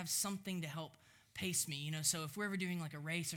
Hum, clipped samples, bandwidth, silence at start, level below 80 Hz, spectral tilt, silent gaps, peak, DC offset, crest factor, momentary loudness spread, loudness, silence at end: none; under 0.1%; over 20 kHz; 0 s; -78 dBFS; -3 dB/octave; none; -22 dBFS; under 0.1%; 20 dB; 10 LU; -40 LUFS; 0 s